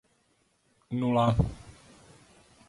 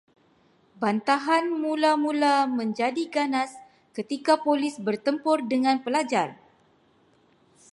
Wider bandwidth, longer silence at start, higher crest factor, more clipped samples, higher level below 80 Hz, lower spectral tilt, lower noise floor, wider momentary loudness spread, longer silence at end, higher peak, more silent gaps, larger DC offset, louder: about the same, 11.5 kHz vs 11.5 kHz; about the same, 0.9 s vs 0.8 s; about the same, 20 dB vs 18 dB; neither; first, -44 dBFS vs -78 dBFS; first, -8 dB/octave vs -4.5 dB/octave; first, -70 dBFS vs -62 dBFS; first, 13 LU vs 7 LU; second, 1 s vs 1.4 s; second, -12 dBFS vs -8 dBFS; neither; neither; second, -28 LUFS vs -25 LUFS